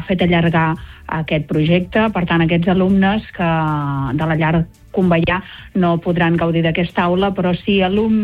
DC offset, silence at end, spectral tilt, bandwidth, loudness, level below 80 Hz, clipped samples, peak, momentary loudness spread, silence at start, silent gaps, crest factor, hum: under 0.1%; 0 s; -9 dB/octave; 4.8 kHz; -16 LUFS; -38 dBFS; under 0.1%; -2 dBFS; 6 LU; 0 s; none; 14 dB; none